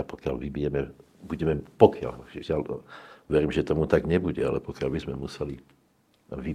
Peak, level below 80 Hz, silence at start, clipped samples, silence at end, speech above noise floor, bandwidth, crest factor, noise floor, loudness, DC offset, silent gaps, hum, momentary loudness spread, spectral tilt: 0 dBFS; -46 dBFS; 0 s; under 0.1%; 0 s; 39 dB; 10.5 kHz; 26 dB; -65 dBFS; -27 LUFS; under 0.1%; none; none; 18 LU; -8 dB/octave